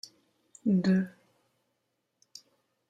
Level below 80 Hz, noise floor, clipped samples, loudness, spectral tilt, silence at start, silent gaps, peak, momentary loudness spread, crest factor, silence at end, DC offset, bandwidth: -72 dBFS; -80 dBFS; under 0.1%; -29 LUFS; -7.5 dB/octave; 0.65 s; none; -16 dBFS; 26 LU; 16 dB; 1.8 s; under 0.1%; 8.6 kHz